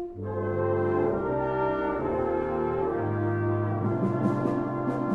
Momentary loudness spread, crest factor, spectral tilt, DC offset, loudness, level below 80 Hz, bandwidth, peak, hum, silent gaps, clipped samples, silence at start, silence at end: 3 LU; 14 dB; -10 dB/octave; under 0.1%; -28 LUFS; -50 dBFS; 5.8 kHz; -14 dBFS; none; none; under 0.1%; 0 s; 0 s